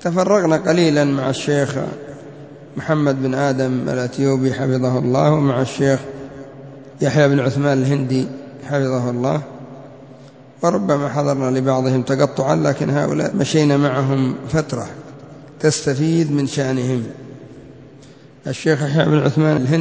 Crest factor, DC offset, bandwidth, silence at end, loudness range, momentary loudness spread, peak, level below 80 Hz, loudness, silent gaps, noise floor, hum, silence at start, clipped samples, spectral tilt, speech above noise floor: 18 dB; 0.1%; 8 kHz; 0 s; 4 LU; 19 LU; 0 dBFS; -54 dBFS; -18 LUFS; none; -43 dBFS; none; 0 s; under 0.1%; -6.5 dB/octave; 26 dB